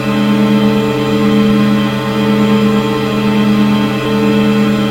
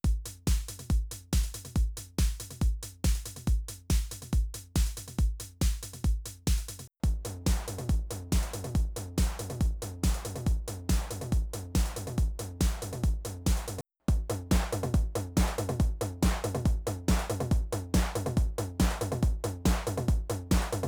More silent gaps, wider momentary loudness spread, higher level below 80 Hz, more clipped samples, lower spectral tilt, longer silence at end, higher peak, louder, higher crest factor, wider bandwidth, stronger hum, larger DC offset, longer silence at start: neither; about the same, 3 LU vs 3 LU; second, -40 dBFS vs -32 dBFS; neither; about the same, -6.5 dB/octave vs -5.5 dB/octave; about the same, 0 s vs 0 s; first, 0 dBFS vs -12 dBFS; first, -12 LUFS vs -32 LUFS; second, 10 dB vs 18 dB; second, 16.5 kHz vs over 20 kHz; neither; neither; about the same, 0 s vs 0.05 s